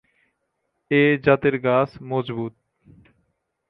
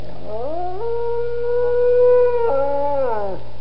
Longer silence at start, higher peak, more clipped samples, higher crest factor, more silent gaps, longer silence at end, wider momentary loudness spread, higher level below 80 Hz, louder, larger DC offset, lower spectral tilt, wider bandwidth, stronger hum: first, 0.9 s vs 0 s; first, -2 dBFS vs -6 dBFS; neither; first, 20 dB vs 12 dB; neither; first, 1.2 s vs 0 s; about the same, 13 LU vs 13 LU; second, -58 dBFS vs -44 dBFS; about the same, -21 LUFS vs -19 LUFS; second, under 0.1% vs 10%; about the same, -9.5 dB/octave vs -9 dB/octave; about the same, 5.6 kHz vs 5.6 kHz; second, none vs 60 Hz at -40 dBFS